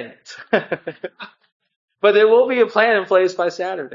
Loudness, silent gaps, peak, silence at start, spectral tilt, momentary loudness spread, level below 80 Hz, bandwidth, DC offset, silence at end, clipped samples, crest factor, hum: -17 LUFS; 1.52-1.60 s, 1.76-1.88 s; 0 dBFS; 0 s; -4.5 dB/octave; 20 LU; -76 dBFS; 7.6 kHz; under 0.1%; 0 s; under 0.1%; 18 dB; none